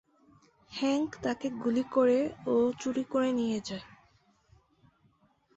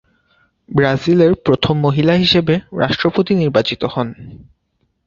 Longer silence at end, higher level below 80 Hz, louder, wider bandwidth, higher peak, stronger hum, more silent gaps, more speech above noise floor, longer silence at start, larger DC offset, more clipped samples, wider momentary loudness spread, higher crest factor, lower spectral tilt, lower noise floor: first, 1.7 s vs 0.65 s; second, -68 dBFS vs -44 dBFS; second, -30 LUFS vs -15 LUFS; first, 8.2 kHz vs 7.4 kHz; second, -16 dBFS vs 0 dBFS; neither; neither; second, 39 dB vs 51 dB; about the same, 0.7 s vs 0.7 s; neither; neither; about the same, 9 LU vs 8 LU; about the same, 16 dB vs 16 dB; second, -5 dB/octave vs -7 dB/octave; about the same, -68 dBFS vs -66 dBFS